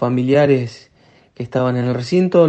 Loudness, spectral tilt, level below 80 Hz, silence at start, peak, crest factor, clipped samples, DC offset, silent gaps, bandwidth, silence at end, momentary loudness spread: -17 LUFS; -8 dB/octave; -58 dBFS; 0 s; 0 dBFS; 16 dB; under 0.1%; under 0.1%; none; 8.6 kHz; 0 s; 12 LU